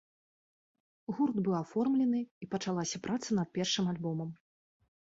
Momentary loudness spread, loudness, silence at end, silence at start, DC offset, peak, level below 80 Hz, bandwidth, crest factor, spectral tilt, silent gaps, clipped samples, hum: 9 LU; -33 LUFS; 0.75 s; 1.1 s; under 0.1%; -18 dBFS; -72 dBFS; 8 kHz; 16 dB; -5 dB/octave; 2.31-2.41 s; under 0.1%; none